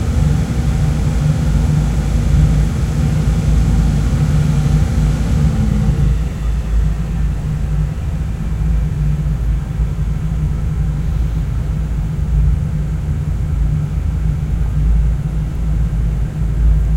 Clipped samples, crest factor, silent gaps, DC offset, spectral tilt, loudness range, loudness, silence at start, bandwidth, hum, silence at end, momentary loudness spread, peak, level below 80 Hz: under 0.1%; 14 dB; none; under 0.1%; -7.5 dB/octave; 4 LU; -17 LUFS; 0 s; 11.5 kHz; none; 0 s; 5 LU; -2 dBFS; -18 dBFS